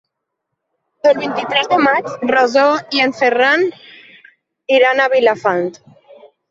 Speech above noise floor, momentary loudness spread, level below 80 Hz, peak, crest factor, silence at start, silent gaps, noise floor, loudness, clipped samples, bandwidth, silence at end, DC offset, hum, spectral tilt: 62 dB; 6 LU; -64 dBFS; 0 dBFS; 16 dB; 1.05 s; none; -76 dBFS; -14 LUFS; under 0.1%; 7.8 kHz; 0.25 s; under 0.1%; none; -4 dB/octave